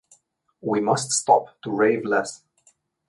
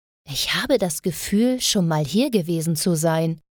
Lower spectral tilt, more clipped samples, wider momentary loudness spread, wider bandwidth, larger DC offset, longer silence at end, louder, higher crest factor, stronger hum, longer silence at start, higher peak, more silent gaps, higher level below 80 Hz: about the same, -3.5 dB/octave vs -4.5 dB/octave; neither; first, 12 LU vs 5 LU; second, 11.5 kHz vs 19.5 kHz; neither; first, 0.75 s vs 0.2 s; about the same, -22 LUFS vs -21 LUFS; about the same, 20 dB vs 16 dB; neither; first, 0.65 s vs 0.25 s; about the same, -4 dBFS vs -6 dBFS; neither; second, -70 dBFS vs -52 dBFS